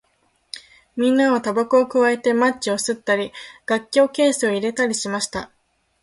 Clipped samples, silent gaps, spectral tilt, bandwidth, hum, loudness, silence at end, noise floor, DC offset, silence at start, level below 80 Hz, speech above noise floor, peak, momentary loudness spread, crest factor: under 0.1%; none; -3.5 dB/octave; 11.5 kHz; none; -19 LUFS; 0.55 s; -65 dBFS; under 0.1%; 0.55 s; -60 dBFS; 45 dB; -4 dBFS; 17 LU; 16 dB